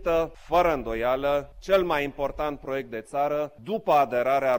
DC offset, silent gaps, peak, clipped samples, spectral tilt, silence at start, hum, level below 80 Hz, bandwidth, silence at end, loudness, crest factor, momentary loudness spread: under 0.1%; none; -10 dBFS; under 0.1%; -5.5 dB/octave; 0 s; none; -46 dBFS; 17 kHz; 0 s; -26 LUFS; 14 dB; 9 LU